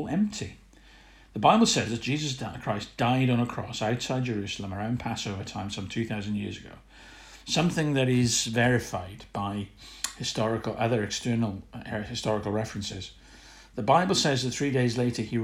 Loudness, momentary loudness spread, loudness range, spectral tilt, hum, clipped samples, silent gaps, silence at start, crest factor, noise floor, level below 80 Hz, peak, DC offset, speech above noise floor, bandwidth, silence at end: -28 LUFS; 13 LU; 5 LU; -4.5 dB/octave; none; under 0.1%; none; 0 s; 22 dB; -53 dBFS; -54 dBFS; -6 dBFS; under 0.1%; 26 dB; 15.5 kHz; 0 s